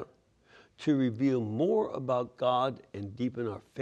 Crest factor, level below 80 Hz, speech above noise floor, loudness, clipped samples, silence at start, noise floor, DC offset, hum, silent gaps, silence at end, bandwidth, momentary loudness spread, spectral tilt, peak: 18 dB; -72 dBFS; 32 dB; -31 LUFS; under 0.1%; 0 s; -63 dBFS; under 0.1%; none; none; 0 s; 8.6 kHz; 9 LU; -8 dB/octave; -14 dBFS